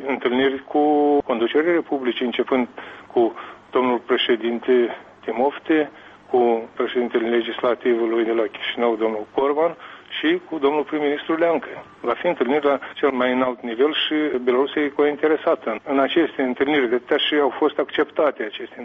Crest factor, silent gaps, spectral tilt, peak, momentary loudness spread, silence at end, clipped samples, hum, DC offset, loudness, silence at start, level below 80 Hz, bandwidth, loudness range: 14 dB; none; -6.5 dB/octave; -8 dBFS; 5 LU; 0 s; under 0.1%; none; under 0.1%; -21 LUFS; 0 s; -64 dBFS; 5.2 kHz; 2 LU